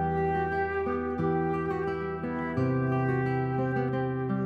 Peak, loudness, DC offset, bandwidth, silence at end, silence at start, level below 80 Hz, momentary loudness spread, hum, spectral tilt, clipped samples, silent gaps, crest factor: -16 dBFS; -29 LUFS; under 0.1%; 5.2 kHz; 0 s; 0 s; -54 dBFS; 4 LU; none; -10 dB/octave; under 0.1%; none; 12 dB